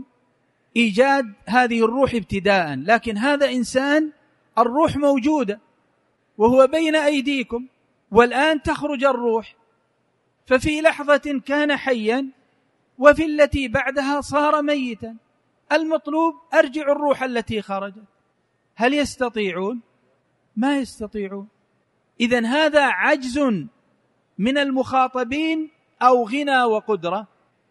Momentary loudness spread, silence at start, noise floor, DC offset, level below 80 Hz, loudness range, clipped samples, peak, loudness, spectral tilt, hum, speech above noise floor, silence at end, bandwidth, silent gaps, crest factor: 12 LU; 0 s; -67 dBFS; under 0.1%; -48 dBFS; 5 LU; under 0.1%; 0 dBFS; -20 LUFS; -5 dB/octave; none; 48 dB; 0.45 s; 11.5 kHz; none; 20 dB